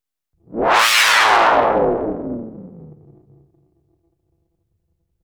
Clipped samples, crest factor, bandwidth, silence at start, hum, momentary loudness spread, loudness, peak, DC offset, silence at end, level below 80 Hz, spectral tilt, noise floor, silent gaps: under 0.1%; 20 dB; over 20 kHz; 0.5 s; none; 20 LU; -14 LUFS; 0 dBFS; under 0.1%; 2.35 s; -48 dBFS; -2 dB/octave; -69 dBFS; none